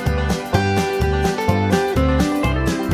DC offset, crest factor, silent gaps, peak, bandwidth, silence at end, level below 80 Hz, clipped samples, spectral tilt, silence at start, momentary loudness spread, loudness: under 0.1%; 16 dB; none; -2 dBFS; 16 kHz; 0 s; -26 dBFS; under 0.1%; -6 dB/octave; 0 s; 3 LU; -19 LUFS